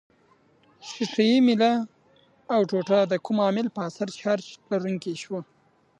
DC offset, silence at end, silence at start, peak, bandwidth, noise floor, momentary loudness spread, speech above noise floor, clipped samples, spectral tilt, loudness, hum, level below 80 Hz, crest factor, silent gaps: under 0.1%; 0.55 s; 0.85 s; -8 dBFS; 9.4 kHz; -61 dBFS; 15 LU; 37 dB; under 0.1%; -6 dB/octave; -25 LUFS; none; -76 dBFS; 18 dB; none